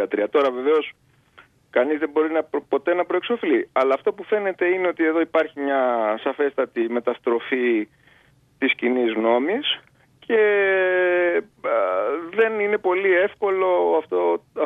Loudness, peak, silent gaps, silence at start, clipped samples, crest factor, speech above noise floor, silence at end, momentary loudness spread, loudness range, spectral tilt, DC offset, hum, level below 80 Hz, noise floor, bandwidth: -21 LUFS; -6 dBFS; none; 0 s; under 0.1%; 16 dB; 36 dB; 0 s; 5 LU; 3 LU; -6 dB/octave; under 0.1%; none; -70 dBFS; -57 dBFS; 5 kHz